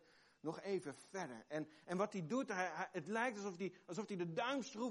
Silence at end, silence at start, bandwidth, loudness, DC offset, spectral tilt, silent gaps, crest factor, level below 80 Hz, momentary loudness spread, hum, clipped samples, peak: 0 s; 0.45 s; 11.5 kHz; -44 LUFS; under 0.1%; -5 dB/octave; none; 18 dB; -90 dBFS; 8 LU; none; under 0.1%; -26 dBFS